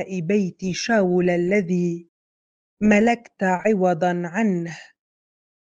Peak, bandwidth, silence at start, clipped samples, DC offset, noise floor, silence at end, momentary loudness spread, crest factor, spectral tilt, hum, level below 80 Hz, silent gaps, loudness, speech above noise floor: -4 dBFS; 8 kHz; 0 s; under 0.1%; under 0.1%; under -90 dBFS; 0.9 s; 9 LU; 18 dB; -6.5 dB/octave; none; -58 dBFS; 2.09-2.77 s; -21 LUFS; over 69 dB